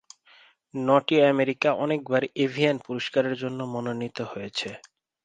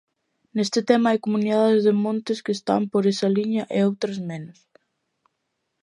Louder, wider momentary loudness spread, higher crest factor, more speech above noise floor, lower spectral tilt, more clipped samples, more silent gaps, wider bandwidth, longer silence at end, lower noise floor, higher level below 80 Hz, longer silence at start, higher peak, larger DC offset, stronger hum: second, -25 LUFS vs -22 LUFS; about the same, 12 LU vs 12 LU; about the same, 20 dB vs 20 dB; second, 32 dB vs 55 dB; about the same, -6 dB/octave vs -6 dB/octave; neither; neither; second, 9.4 kHz vs 11 kHz; second, 0.4 s vs 1.3 s; second, -57 dBFS vs -77 dBFS; about the same, -70 dBFS vs -72 dBFS; first, 0.75 s vs 0.55 s; second, -6 dBFS vs -2 dBFS; neither; neither